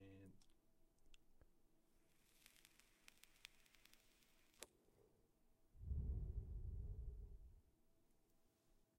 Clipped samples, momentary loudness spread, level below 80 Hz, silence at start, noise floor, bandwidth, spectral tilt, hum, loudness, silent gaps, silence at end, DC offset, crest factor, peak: under 0.1%; 19 LU; -58 dBFS; 0 s; -79 dBFS; 16 kHz; -5.5 dB/octave; none; -55 LUFS; none; 0.2 s; under 0.1%; 26 dB; -32 dBFS